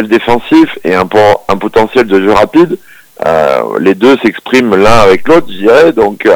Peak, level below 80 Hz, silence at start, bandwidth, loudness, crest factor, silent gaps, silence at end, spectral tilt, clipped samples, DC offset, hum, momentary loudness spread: 0 dBFS; -32 dBFS; 0 s; over 20 kHz; -8 LUFS; 8 dB; none; 0 s; -5.5 dB/octave; 6%; under 0.1%; none; 5 LU